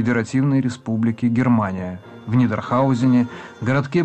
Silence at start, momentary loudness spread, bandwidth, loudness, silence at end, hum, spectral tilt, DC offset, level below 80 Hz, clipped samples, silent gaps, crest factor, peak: 0 s; 10 LU; 8.6 kHz; -20 LUFS; 0 s; none; -8 dB/octave; under 0.1%; -56 dBFS; under 0.1%; none; 12 dB; -8 dBFS